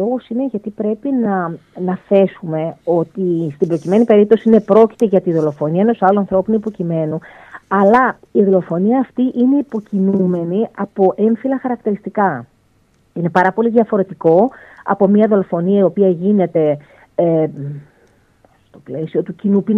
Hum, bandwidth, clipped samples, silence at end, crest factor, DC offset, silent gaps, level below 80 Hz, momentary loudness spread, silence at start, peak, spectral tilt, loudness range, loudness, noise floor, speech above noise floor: none; 6.6 kHz; under 0.1%; 0 s; 14 dB; under 0.1%; none; -58 dBFS; 10 LU; 0 s; 0 dBFS; -9.5 dB/octave; 5 LU; -15 LUFS; -56 dBFS; 41 dB